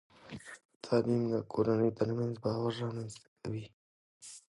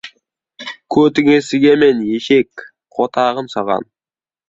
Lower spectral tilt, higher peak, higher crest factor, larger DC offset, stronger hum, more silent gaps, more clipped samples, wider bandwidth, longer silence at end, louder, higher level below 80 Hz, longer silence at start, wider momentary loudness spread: first, -7 dB/octave vs -5.5 dB/octave; second, -16 dBFS vs -2 dBFS; about the same, 18 dB vs 14 dB; neither; neither; first, 0.65-0.69 s, 0.76-0.80 s, 3.28-3.36 s, 3.73-4.20 s vs none; neither; first, 11.5 kHz vs 7.8 kHz; second, 0.1 s vs 0.65 s; second, -34 LUFS vs -14 LUFS; second, -66 dBFS vs -56 dBFS; first, 0.25 s vs 0.05 s; about the same, 20 LU vs 18 LU